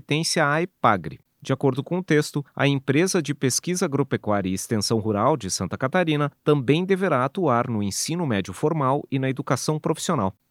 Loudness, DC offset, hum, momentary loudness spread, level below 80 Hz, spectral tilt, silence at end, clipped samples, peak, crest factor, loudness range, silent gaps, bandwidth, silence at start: -23 LUFS; under 0.1%; none; 5 LU; -62 dBFS; -5 dB/octave; 0.2 s; under 0.1%; -4 dBFS; 20 dB; 1 LU; none; 16 kHz; 0.1 s